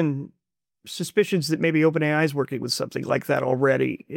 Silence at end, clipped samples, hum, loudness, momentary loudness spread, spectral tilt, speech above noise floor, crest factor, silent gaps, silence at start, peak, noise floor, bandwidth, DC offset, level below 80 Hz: 0 s; under 0.1%; none; -23 LUFS; 10 LU; -5.5 dB/octave; 41 dB; 16 dB; none; 0 s; -8 dBFS; -64 dBFS; 17 kHz; under 0.1%; -68 dBFS